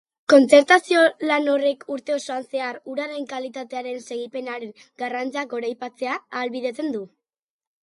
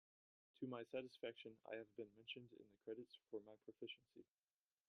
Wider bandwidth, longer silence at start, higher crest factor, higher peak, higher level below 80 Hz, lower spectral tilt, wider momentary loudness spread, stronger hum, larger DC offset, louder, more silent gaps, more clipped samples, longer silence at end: first, 11.5 kHz vs 10 kHz; second, 0.3 s vs 0.6 s; about the same, 22 dB vs 20 dB; first, 0 dBFS vs -36 dBFS; first, -76 dBFS vs under -90 dBFS; second, -3 dB/octave vs -6 dB/octave; first, 17 LU vs 9 LU; neither; neither; first, -22 LUFS vs -55 LUFS; neither; neither; about the same, 0.75 s vs 0.65 s